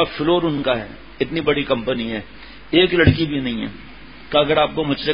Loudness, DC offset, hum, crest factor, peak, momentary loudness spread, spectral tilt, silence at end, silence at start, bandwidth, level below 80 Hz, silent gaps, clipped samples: -19 LUFS; 0.7%; none; 20 dB; 0 dBFS; 13 LU; -11 dB/octave; 0 s; 0 s; 5.4 kHz; -38 dBFS; none; under 0.1%